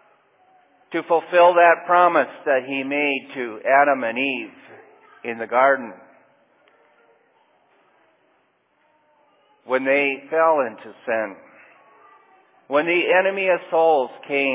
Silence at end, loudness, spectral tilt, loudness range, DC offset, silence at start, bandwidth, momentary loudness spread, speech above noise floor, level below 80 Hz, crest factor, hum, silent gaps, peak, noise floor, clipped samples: 0 s; -19 LUFS; -7.5 dB/octave; 8 LU; under 0.1%; 0.9 s; 3.9 kHz; 14 LU; 45 dB; -86 dBFS; 20 dB; none; none; -2 dBFS; -64 dBFS; under 0.1%